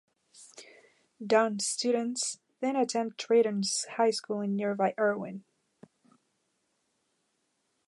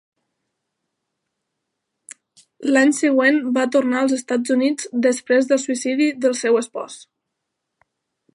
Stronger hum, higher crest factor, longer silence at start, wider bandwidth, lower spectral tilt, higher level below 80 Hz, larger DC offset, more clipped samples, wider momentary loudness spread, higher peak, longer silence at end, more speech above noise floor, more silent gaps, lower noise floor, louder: neither; about the same, 20 dB vs 18 dB; second, 0.4 s vs 2.6 s; about the same, 11.5 kHz vs 11.5 kHz; about the same, -3.5 dB/octave vs -3 dB/octave; second, -84 dBFS vs -76 dBFS; neither; neither; first, 17 LU vs 8 LU; second, -12 dBFS vs -2 dBFS; first, 2.5 s vs 1.3 s; second, 48 dB vs 60 dB; neither; about the same, -77 dBFS vs -79 dBFS; second, -29 LUFS vs -19 LUFS